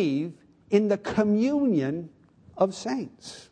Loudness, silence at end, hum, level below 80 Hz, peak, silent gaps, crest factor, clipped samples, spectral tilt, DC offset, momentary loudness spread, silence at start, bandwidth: -26 LUFS; 0.1 s; none; -62 dBFS; -8 dBFS; none; 18 dB; under 0.1%; -6.5 dB/octave; under 0.1%; 14 LU; 0 s; 10 kHz